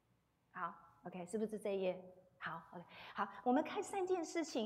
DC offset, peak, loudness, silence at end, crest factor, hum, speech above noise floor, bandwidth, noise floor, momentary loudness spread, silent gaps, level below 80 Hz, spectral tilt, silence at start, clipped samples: under 0.1%; -24 dBFS; -42 LUFS; 0 s; 18 dB; none; 37 dB; 15 kHz; -79 dBFS; 17 LU; none; -82 dBFS; -4.5 dB/octave; 0.55 s; under 0.1%